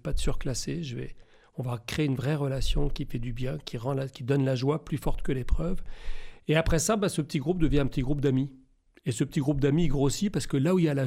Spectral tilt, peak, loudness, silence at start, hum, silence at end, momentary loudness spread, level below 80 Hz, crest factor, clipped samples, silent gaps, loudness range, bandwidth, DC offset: -6 dB/octave; -10 dBFS; -29 LUFS; 0.05 s; none; 0 s; 11 LU; -34 dBFS; 18 dB; under 0.1%; none; 4 LU; 15.5 kHz; under 0.1%